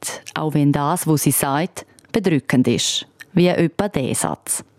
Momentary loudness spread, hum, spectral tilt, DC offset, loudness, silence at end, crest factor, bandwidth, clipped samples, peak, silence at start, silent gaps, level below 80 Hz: 8 LU; none; -4.5 dB/octave; under 0.1%; -19 LUFS; 0.15 s; 16 dB; 16.5 kHz; under 0.1%; -4 dBFS; 0 s; none; -52 dBFS